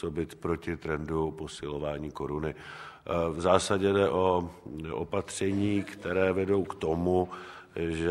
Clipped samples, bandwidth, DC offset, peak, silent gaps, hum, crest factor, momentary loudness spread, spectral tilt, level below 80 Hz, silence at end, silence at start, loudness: under 0.1%; 13 kHz; under 0.1%; -8 dBFS; none; none; 22 dB; 12 LU; -6 dB/octave; -52 dBFS; 0 s; 0 s; -30 LUFS